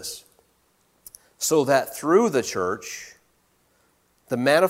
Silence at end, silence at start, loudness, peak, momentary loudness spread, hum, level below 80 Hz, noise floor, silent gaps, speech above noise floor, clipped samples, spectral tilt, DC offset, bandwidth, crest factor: 0 s; 0 s; -23 LUFS; -4 dBFS; 17 LU; none; -66 dBFS; -65 dBFS; none; 44 dB; under 0.1%; -4 dB/octave; under 0.1%; 16.5 kHz; 20 dB